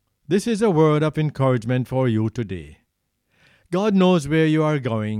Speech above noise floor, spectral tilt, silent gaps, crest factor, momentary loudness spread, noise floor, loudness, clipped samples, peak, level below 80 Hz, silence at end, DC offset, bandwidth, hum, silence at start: 53 dB; -7.5 dB/octave; none; 16 dB; 9 LU; -72 dBFS; -20 LUFS; under 0.1%; -6 dBFS; -52 dBFS; 0 s; under 0.1%; 13 kHz; none; 0.3 s